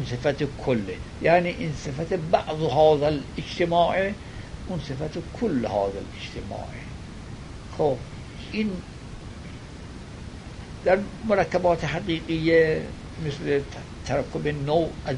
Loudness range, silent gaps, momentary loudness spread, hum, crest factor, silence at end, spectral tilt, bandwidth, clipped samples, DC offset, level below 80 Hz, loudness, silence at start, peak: 9 LU; none; 19 LU; none; 20 dB; 0 s; -6.5 dB/octave; 10.5 kHz; under 0.1%; under 0.1%; -42 dBFS; -25 LUFS; 0 s; -6 dBFS